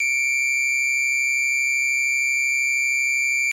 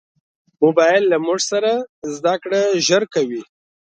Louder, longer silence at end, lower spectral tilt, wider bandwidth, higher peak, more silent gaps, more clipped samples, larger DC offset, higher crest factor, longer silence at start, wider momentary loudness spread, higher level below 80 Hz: about the same, -18 LUFS vs -17 LUFS; second, 0 s vs 0.55 s; second, 6 dB/octave vs -3.5 dB/octave; first, 17 kHz vs 9.4 kHz; second, -14 dBFS vs -2 dBFS; second, none vs 1.89-2.02 s; neither; neither; second, 6 dB vs 16 dB; second, 0 s vs 0.6 s; second, 0 LU vs 9 LU; second, -90 dBFS vs -70 dBFS